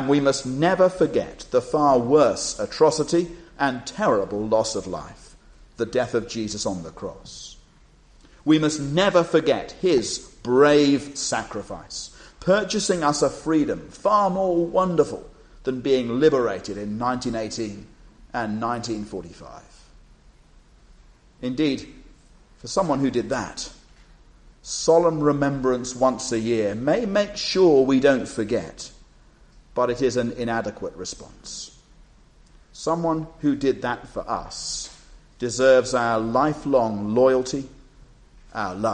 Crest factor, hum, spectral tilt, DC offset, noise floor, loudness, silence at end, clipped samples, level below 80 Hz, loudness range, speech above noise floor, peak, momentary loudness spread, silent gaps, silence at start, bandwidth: 18 dB; none; -5 dB/octave; under 0.1%; -53 dBFS; -22 LUFS; 0 s; under 0.1%; -50 dBFS; 9 LU; 31 dB; -4 dBFS; 16 LU; none; 0 s; 10 kHz